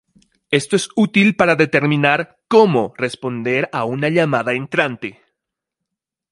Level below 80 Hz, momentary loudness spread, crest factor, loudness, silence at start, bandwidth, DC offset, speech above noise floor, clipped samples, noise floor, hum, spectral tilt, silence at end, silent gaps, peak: -60 dBFS; 9 LU; 18 dB; -17 LUFS; 0.5 s; 11.5 kHz; under 0.1%; 65 dB; under 0.1%; -81 dBFS; none; -5.5 dB/octave; 1.2 s; none; 0 dBFS